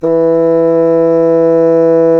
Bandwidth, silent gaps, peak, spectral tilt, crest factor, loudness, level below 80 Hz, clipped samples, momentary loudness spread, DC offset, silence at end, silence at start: 5.8 kHz; none; 0 dBFS; -10 dB/octave; 8 dB; -9 LUFS; -54 dBFS; under 0.1%; 1 LU; under 0.1%; 0 s; 0 s